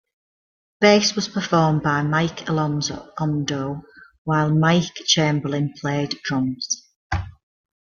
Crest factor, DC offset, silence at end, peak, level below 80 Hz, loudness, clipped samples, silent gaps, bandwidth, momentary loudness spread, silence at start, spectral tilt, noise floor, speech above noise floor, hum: 22 dB; under 0.1%; 0.55 s; 0 dBFS; -48 dBFS; -21 LUFS; under 0.1%; 4.18-4.25 s, 6.96-7.10 s; 7.2 kHz; 11 LU; 0.8 s; -4.5 dB/octave; under -90 dBFS; over 70 dB; none